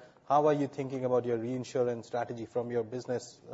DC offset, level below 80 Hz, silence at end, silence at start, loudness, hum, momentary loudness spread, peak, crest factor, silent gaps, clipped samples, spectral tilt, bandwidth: under 0.1%; -74 dBFS; 0 s; 0 s; -32 LUFS; none; 9 LU; -14 dBFS; 18 dB; none; under 0.1%; -6.5 dB/octave; 8 kHz